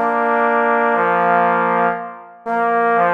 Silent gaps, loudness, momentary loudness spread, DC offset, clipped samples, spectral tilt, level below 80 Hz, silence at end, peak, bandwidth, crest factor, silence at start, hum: none; -16 LUFS; 10 LU; under 0.1%; under 0.1%; -7.5 dB/octave; -72 dBFS; 0 s; -2 dBFS; 5.6 kHz; 14 dB; 0 s; none